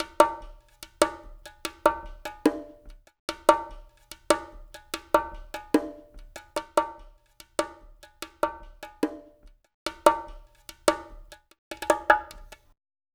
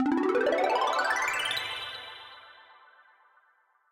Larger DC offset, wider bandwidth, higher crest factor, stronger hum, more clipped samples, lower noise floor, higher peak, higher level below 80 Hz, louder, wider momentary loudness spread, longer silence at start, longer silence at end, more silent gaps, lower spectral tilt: neither; first, over 20 kHz vs 16.5 kHz; first, 30 dB vs 16 dB; neither; neither; second, -55 dBFS vs -67 dBFS; first, 0 dBFS vs -16 dBFS; first, -50 dBFS vs -70 dBFS; about the same, -27 LUFS vs -28 LUFS; first, 24 LU vs 19 LU; about the same, 0 s vs 0 s; second, 0.7 s vs 1.4 s; first, 3.19-3.28 s, 9.74-9.86 s, 11.58-11.71 s vs none; about the same, -3 dB/octave vs -2 dB/octave